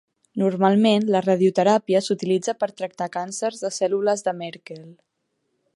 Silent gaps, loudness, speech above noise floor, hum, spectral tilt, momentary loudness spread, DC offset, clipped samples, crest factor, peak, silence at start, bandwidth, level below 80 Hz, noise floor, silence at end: none; -21 LUFS; 53 dB; none; -5.5 dB/octave; 15 LU; under 0.1%; under 0.1%; 18 dB; -4 dBFS; 0.35 s; 11.5 kHz; -74 dBFS; -74 dBFS; 0.8 s